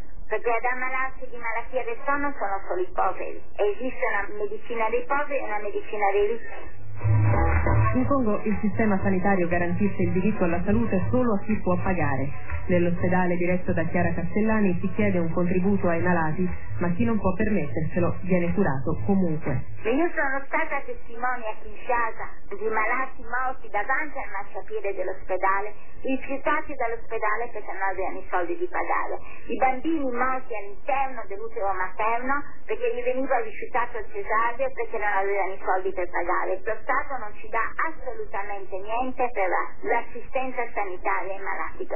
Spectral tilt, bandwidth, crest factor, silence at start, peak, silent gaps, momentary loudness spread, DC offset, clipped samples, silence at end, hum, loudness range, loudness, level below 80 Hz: -11 dB/octave; 3.2 kHz; 16 dB; 0.05 s; -8 dBFS; none; 9 LU; 6%; under 0.1%; 0 s; none; 4 LU; -27 LUFS; -40 dBFS